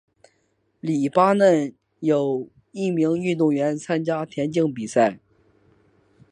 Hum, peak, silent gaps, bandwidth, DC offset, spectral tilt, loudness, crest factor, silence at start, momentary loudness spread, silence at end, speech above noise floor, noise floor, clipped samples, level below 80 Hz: none; -4 dBFS; none; 11 kHz; under 0.1%; -6.5 dB/octave; -22 LUFS; 18 dB; 0.85 s; 10 LU; 1.15 s; 47 dB; -68 dBFS; under 0.1%; -68 dBFS